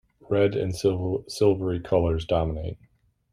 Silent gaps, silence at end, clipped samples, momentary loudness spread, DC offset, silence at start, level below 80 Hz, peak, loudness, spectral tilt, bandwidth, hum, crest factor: none; 0.55 s; under 0.1%; 8 LU; under 0.1%; 0.3 s; -44 dBFS; -8 dBFS; -25 LUFS; -7 dB/octave; 14 kHz; none; 18 dB